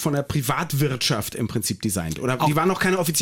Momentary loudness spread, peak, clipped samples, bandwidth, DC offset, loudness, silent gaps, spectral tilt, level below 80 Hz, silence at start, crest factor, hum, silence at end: 5 LU; -8 dBFS; under 0.1%; 17 kHz; under 0.1%; -23 LUFS; none; -4.5 dB/octave; -50 dBFS; 0 s; 14 dB; none; 0 s